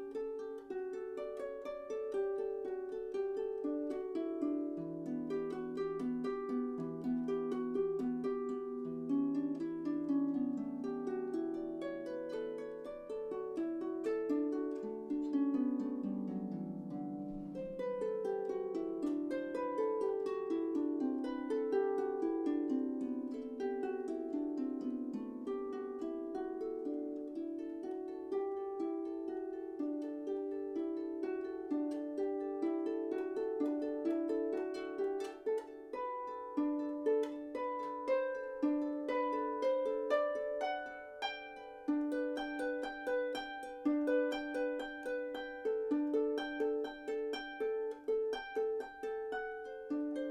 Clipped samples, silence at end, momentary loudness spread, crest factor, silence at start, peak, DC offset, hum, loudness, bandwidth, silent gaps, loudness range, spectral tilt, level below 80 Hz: under 0.1%; 0 s; 8 LU; 18 dB; 0 s; -20 dBFS; under 0.1%; none; -39 LUFS; 9.4 kHz; none; 4 LU; -6.5 dB/octave; -72 dBFS